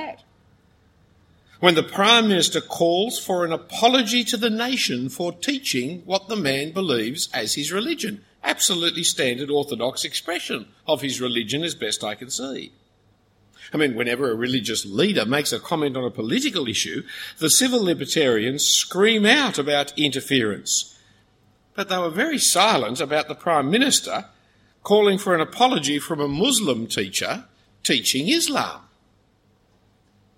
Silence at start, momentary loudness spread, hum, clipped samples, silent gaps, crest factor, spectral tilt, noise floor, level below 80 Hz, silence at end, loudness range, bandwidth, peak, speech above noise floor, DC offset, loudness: 0 s; 11 LU; none; under 0.1%; none; 22 dB; -2.5 dB/octave; -61 dBFS; -62 dBFS; 1.6 s; 6 LU; 16.5 kHz; 0 dBFS; 40 dB; under 0.1%; -21 LUFS